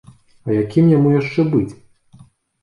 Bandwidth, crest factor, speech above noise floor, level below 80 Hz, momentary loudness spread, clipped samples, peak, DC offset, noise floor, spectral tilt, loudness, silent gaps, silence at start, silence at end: 10.5 kHz; 14 dB; 33 dB; -52 dBFS; 12 LU; under 0.1%; -2 dBFS; under 0.1%; -48 dBFS; -9.5 dB/octave; -16 LUFS; none; 0.45 s; 0.9 s